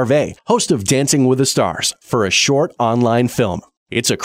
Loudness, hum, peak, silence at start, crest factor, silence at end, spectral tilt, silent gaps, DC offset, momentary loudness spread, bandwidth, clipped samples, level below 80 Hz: -16 LUFS; none; -2 dBFS; 0 s; 14 dB; 0 s; -4 dB/octave; 3.77-3.86 s; under 0.1%; 6 LU; 16 kHz; under 0.1%; -50 dBFS